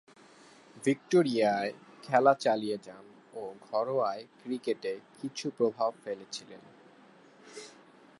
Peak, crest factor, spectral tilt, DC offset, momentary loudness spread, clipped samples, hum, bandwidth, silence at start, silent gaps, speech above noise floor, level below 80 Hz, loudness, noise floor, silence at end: -10 dBFS; 22 dB; -5 dB/octave; under 0.1%; 22 LU; under 0.1%; none; 11.5 kHz; 0.75 s; none; 27 dB; -82 dBFS; -31 LUFS; -58 dBFS; 0.5 s